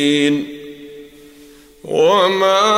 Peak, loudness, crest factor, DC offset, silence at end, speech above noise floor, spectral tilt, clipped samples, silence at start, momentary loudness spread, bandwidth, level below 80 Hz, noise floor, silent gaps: -2 dBFS; -15 LUFS; 14 dB; under 0.1%; 0 s; 30 dB; -4 dB/octave; under 0.1%; 0 s; 24 LU; 16 kHz; -58 dBFS; -43 dBFS; none